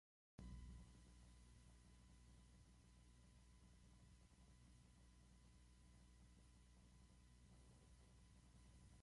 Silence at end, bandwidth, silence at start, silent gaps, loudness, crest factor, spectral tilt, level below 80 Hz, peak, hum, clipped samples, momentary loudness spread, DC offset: 0 s; 11.5 kHz; 0.4 s; none; -65 LUFS; 22 dB; -5 dB/octave; -68 dBFS; -46 dBFS; 60 Hz at -70 dBFS; under 0.1%; 8 LU; under 0.1%